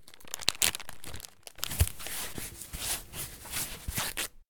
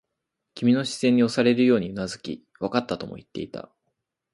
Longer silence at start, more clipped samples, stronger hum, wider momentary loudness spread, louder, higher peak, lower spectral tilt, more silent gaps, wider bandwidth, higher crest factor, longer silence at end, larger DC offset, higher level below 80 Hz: second, 0.1 s vs 0.55 s; neither; neither; about the same, 16 LU vs 16 LU; second, -33 LUFS vs -23 LUFS; first, -2 dBFS vs -6 dBFS; second, -1.5 dB/octave vs -5.5 dB/octave; neither; first, over 20 kHz vs 11.5 kHz; first, 32 dB vs 18 dB; second, 0 s vs 0.7 s; neither; first, -44 dBFS vs -60 dBFS